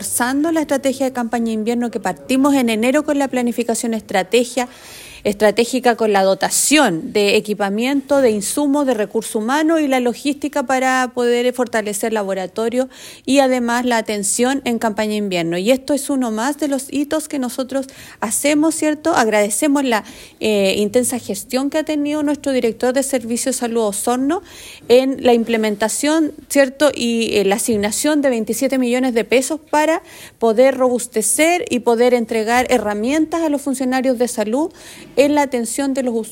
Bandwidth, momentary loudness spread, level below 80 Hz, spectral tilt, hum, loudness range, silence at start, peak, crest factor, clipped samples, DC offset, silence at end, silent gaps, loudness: 16.5 kHz; 7 LU; -54 dBFS; -3.5 dB/octave; none; 3 LU; 0 s; 0 dBFS; 16 dB; under 0.1%; under 0.1%; 0 s; none; -17 LUFS